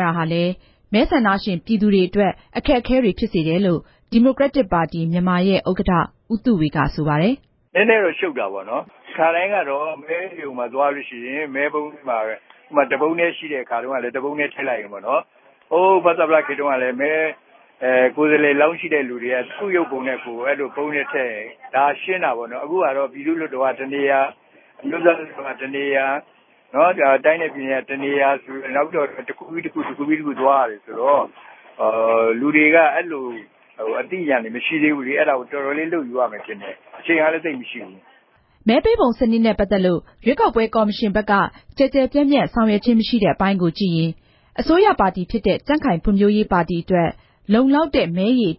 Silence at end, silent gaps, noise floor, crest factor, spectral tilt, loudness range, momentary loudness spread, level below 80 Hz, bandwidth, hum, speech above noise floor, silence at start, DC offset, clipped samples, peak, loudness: 0.05 s; none; -55 dBFS; 18 dB; -11 dB/octave; 4 LU; 11 LU; -44 dBFS; 5.8 kHz; none; 37 dB; 0 s; under 0.1%; under 0.1%; 0 dBFS; -19 LUFS